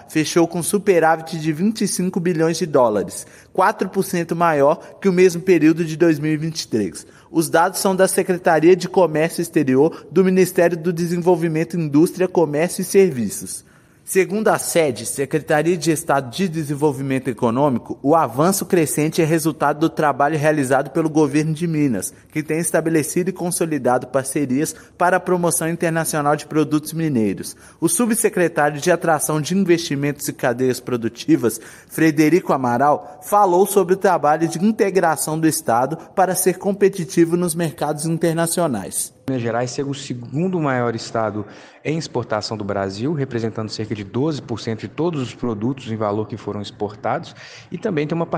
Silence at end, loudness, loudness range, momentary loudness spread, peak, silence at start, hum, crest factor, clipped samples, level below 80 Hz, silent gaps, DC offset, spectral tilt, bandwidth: 0 s; -19 LUFS; 7 LU; 9 LU; -2 dBFS; 0 s; none; 16 dB; under 0.1%; -58 dBFS; none; under 0.1%; -5.5 dB/octave; 16 kHz